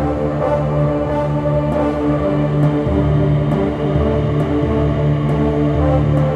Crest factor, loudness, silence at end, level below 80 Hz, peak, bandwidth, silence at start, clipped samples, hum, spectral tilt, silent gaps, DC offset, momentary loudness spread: 12 dB; -16 LUFS; 0 s; -26 dBFS; -4 dBFS; 5 kHz; 0 s; under 0.1%; none; -9.5 dB/octave; none; under 0.1%; 2 LU